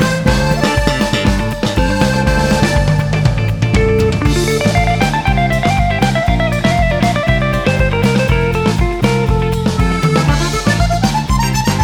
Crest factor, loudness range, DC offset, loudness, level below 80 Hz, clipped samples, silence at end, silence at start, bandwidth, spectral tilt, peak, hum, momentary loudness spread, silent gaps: 12 dB; 1 LU; under 0.1%; -14 LUFS; -20 dBFS; under 0.1%; 0 s; 0 s; 18.5 kHz; -5.5 dB/octave; 0 dBFS; none; 2 LU; none